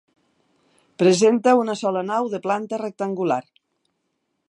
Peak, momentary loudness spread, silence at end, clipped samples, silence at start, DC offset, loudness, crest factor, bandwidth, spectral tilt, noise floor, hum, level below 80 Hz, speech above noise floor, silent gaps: -4 dBFS; 11 LU; 1.1 s; under 0.1%; 1 s; under 0.1%; -21 LUFS; 20 dB; 11.5 kHz; -5 dB/octave; -74 dBFS; none; -76 dBFS; 54 dB; none